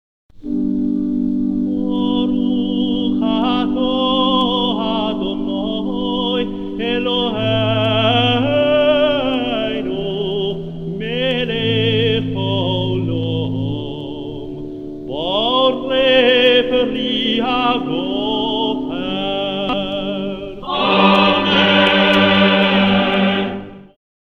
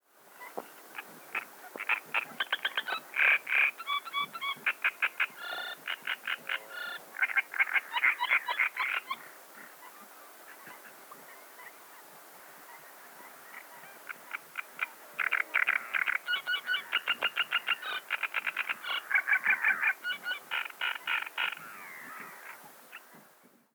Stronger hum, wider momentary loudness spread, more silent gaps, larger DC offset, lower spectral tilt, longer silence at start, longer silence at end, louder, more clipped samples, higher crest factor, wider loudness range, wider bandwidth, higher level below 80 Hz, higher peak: neither; second, 12 LU vs 22 LU; neither; neither; first, -7 dB/octave vs 0.5 dB/octave; about the same, 0.35 s vs 0.3 s; about the same, 0.5 s vs 0.55 s; first, -16 LUFS vs -30 LUFS; neither; second, 16 dB vs 22 dB; second, 6 LU vs 19 LU; second, 7 kHz vs over 20 kHz; first, -40 dBFS vs under -90 dBFS; first, 0 dBFS vs -14 dBFS